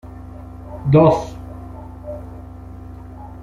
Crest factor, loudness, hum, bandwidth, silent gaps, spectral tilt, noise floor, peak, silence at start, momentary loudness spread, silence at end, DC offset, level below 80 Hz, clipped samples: 20 dB; -15 LUFS; none; 7.4 kHz; none; -9 dB/octave; -35 dBFS; -2 dBFS; 0.05 s; 24 LU; 0 s; under 0.1%; -38 dBFS; under 0.1%